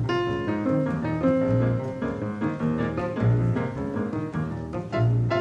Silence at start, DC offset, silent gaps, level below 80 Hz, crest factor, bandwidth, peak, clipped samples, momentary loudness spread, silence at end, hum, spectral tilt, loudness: 0 s; under 0.1%; none; -46 dBFS; 14 dB; 7 kHz; -10 dBFS; under 0.1%; 7 LU; 0 s; none; -9 dB/octave; -26 LUFS